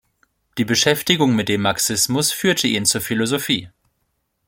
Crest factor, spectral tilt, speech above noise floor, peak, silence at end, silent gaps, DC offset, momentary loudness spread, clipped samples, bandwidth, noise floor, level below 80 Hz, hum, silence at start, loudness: 18 dB; -3 dB/octave; 52 dB; -2 dBFS; 0.8 s; none; under 0.1%; 5 LU; under 0.1%; 17 kHz; -71 dBFS; -56 dBFS; none; 0.55 s; -18 LUFS